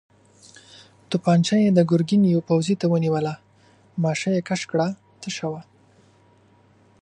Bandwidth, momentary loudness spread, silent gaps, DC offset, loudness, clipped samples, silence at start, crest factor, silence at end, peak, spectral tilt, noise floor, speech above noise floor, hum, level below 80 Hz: 9.8 kHz; 14 LU; none; under 0.1%; -22 LUFS; under 0.1%; 1.1 s; 18 dB; 1.4 s; -4 dBFS; -6.5 dB/octave; -56 dBFS; 36 dB; none; -66 dBFS